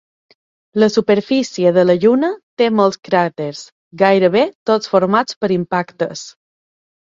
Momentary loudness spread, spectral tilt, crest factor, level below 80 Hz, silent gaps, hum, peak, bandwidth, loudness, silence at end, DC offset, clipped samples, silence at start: 11 LU; -6 dB/octave; 16 dB; -60 dBFS; 2.43-2.57 s, 3.72-3.91 s, 4.55-4.66 s, 5.36-5.41 s; none; 0 dBFS; 7.8 kHz; -15 LUFS; 0.75 s; under 0.1%; under 0.1%; 0.75 s